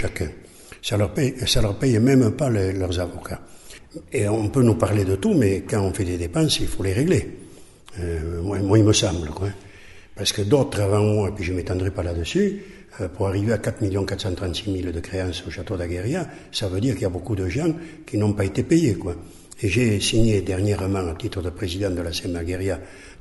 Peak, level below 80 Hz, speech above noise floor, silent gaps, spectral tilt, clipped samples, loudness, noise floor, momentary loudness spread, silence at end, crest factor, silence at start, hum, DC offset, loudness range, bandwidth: -4 dBFS; -38 dBFS; 21 dB; none; -5.5 dB/octave; under 0.1%; -23 LUFS; -43 dBFS; 13 LU; 0.05 s; 18 dB; 0 s; none; under 0.1%; 5 LU; 12 kHz